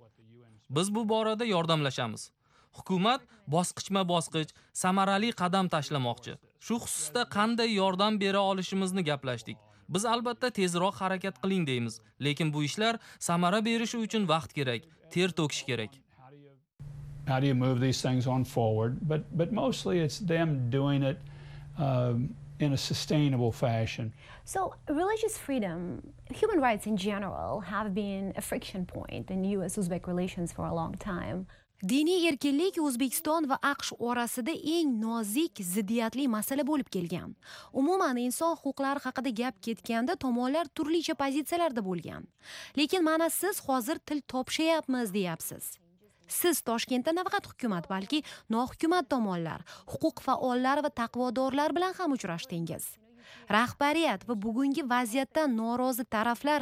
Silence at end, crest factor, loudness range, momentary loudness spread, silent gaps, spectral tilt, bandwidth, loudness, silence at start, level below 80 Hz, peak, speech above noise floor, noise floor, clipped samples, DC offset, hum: 0 s; 18 dB; 3 LU; 10 LU; none; -5 dB/octave; 16 kHz; -30 LUFS; 0.7 s; -60 dBFS; -12 dBFS; 28 dB; -58 dBFS; under 0.1%; under 0.1%; none